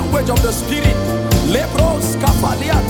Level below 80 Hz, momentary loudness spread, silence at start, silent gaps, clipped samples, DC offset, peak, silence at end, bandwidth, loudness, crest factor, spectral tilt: -22 dBFS; 1 LU; 0 s; none; under 0.1%; under 0.1%; 0 dBFS; 0 s; 19 kHz; -16 LUFS; 14 dB; -5.5 dB/octave